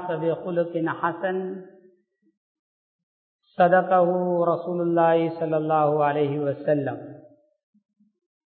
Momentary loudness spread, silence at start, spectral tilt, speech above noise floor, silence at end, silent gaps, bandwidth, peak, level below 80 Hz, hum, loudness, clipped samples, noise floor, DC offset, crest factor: 12 LU; 0 s; -11.5 dB/octave; 41 dB; 1.3 s; 2.37-3.39 s; 4.5 kHz; -6 dBFS; -76 dBFS; none; -23 LUFS; under 0.1%; -63 dBFS; under 0.1%; 18 dB